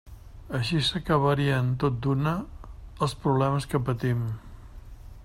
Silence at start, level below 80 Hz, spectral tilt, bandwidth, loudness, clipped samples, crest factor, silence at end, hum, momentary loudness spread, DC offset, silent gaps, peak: 0.05 s; -46 dBFS; -6.5 dB/octave; 13 kHz; -26 LUFS; under 0.1%; 18 dB; 0 s; none; 11 LU; under 0.1%; none; -10 dBFS